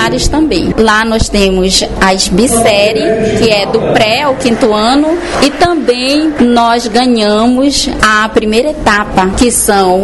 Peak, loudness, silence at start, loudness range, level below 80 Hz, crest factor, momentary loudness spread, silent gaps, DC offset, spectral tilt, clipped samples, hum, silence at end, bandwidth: 0 dBFS; -9 LUFS; 0 s; 1 LU; -24 dBFS; 8 dB; 3 LU; none; 1%; -3.5 dB/octave; 0.1%; none; 0 s; 12 kHz